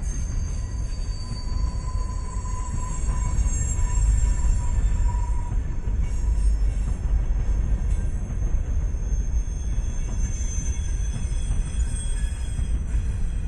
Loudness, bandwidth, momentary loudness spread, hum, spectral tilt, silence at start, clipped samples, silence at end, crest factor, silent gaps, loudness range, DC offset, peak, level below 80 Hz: -28 LUFS; 11 kHz; 6 LU; none; -5.5 dB/octave; 0 s; under 0.1%; 0 s; 14 dB; none; 3 LU; under 0.1%; -8 dBFS; -24 dBFS